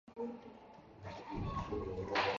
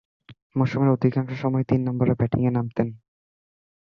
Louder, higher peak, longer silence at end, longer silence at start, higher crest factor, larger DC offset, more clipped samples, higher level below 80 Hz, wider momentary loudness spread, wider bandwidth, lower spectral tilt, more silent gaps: second, -42 LUFS vs -23 LUFS; second, -22 dBFS vs -6 dBFS; second, 0 s vs 1 s; second, 0.05 s vs 0.3 s; about the same, 20 dB vs 18 dB; neither; neither; about the same, -54 dBFS vs -52 dBFS; first, 18 LU vs 7 LU; first, 7.4 kHz vs 6.2 kHz; second, -3.5 dB/octave vs -10 dB/octave; second, none vs 0.42-0.50 s